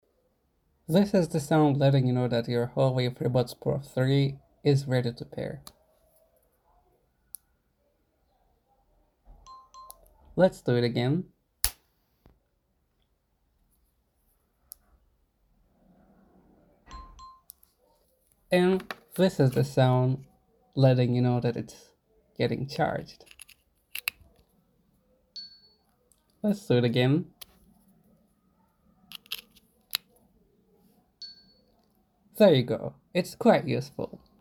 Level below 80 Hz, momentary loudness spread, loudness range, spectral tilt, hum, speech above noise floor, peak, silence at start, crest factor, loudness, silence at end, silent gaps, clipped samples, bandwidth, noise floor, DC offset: -58 dBFS; 24 LU; 15 LU; -6.5 dB/octave; none; 48 dB; 0 dBFS; 0.9 s; 30 dB; -27 LUFS; 0.25 s; none; under 0.1%; over 20 kHz; -73 dBFS; under 0.1%